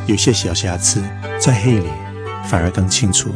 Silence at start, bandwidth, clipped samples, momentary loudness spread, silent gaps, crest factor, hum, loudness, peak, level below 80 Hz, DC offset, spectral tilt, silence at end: 0 s; 10.5 kHz; under 0.1%; 12 LU; none; 16 dB; none; -16 LUFS; 0 dBFS; -36 dBFS; under 0.1%; -4 dB/octave; 0 s